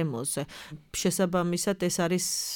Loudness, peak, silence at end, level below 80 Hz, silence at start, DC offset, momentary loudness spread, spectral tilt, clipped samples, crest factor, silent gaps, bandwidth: -28 LUFS; -14 dBFS; 0 s; -58 dBFS; 0 s; under 0.1%; 9 LU; -4 dB/octave; under 0.1%; 14 dB; none; 19.5 kHz